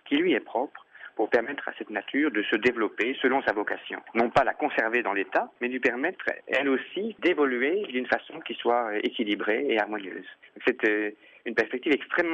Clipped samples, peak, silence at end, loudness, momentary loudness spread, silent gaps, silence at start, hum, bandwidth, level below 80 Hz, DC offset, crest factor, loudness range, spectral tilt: under 0.1%; -10 dBFS; 0 s; -27 LUFS; 9 LU; none; 0.05 s; none; 8.2 kHz; -64 dBFS; under 0.1%; 18 dB; 2 LU; -5.5 dB/octave